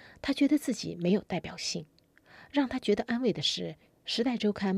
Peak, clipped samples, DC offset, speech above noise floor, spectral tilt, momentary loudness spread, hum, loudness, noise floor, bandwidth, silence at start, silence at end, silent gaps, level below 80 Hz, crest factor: -16 dBFS; under 0.1%; under 0.1%; 28 dB; -5 dB/octave; 9 LU; none; -30 LUFS; -58 dBFS; 15 kHz; 0 s; 0 s; none; -62 dBFS; 16 dB